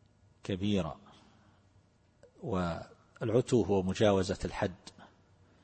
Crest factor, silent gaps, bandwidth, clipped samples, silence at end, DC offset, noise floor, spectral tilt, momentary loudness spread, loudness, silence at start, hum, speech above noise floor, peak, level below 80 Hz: 22 dB; none; 8.8 kHz; under 0.1%; 0.6 s; under 0.1%; -66 dBFS; -6.5 dB/octave; 20 LU; -32 LUFS; 0.45 s; none; 35 dB; -12 dBFS; -56 dBFS